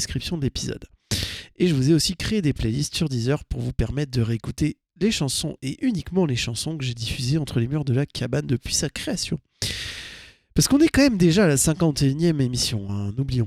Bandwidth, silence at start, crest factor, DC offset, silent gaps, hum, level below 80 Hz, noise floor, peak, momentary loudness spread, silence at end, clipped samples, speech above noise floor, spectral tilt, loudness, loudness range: 16 kHz; 0 s; 18 dB; under 0.1%; none; none; -40 dBFS; -44 dBFS; -6 dBFS; 11 LU; 0 s; under 0.1%; 22 dB; -5 dB/octave; -23 LUFS; 5 LU